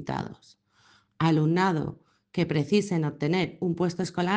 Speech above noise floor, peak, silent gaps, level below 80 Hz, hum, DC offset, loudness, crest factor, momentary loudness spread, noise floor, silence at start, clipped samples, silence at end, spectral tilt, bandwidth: 36 dB; -10 dBFS; none; -62 dBFS; none; under 0.1%; -27 LUFS; 16 dB; 11 LU; -62 dBFS; 0 s; under 0.1%; 0 s; -6.5 dB/octave; 9.2 kHz